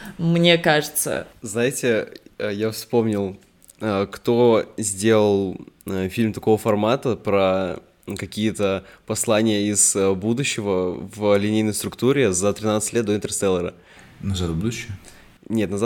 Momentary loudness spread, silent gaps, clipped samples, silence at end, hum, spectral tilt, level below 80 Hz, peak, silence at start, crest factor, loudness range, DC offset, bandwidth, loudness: 12 LU; none; under 0.1%; 0 s; none; -4.5 dB/octave; -52 dBFS; -2 dBFS; 0 s; 20 dB; 3 LU; under 0.1%; 18.5 kHz; -21 LUFS